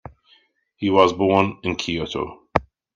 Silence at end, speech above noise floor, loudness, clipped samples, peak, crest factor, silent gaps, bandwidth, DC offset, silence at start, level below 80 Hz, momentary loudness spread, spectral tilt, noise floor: 0.35 s; 39 dB; -21 LUFS; under 0.1%; 0 dBFS; 22 dB; none; 9 kHz; under 0.1%; 0.05 s; -48 dBFS; 11 LU; -5.5 dB/octave; -59 dBFS